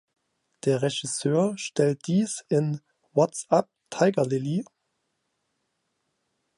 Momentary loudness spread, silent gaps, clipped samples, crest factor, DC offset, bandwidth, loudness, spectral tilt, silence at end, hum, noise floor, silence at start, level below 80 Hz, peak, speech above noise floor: 8 LU; none; under 0.1%; 20 dB; under 0.1%; 11.5 kHz; -26 LUFS; -5.5 dB/octave; 1.95 s; none; -77 dBFS; 0.65 s; -74 dBFS; -8 dBFS; 53 dB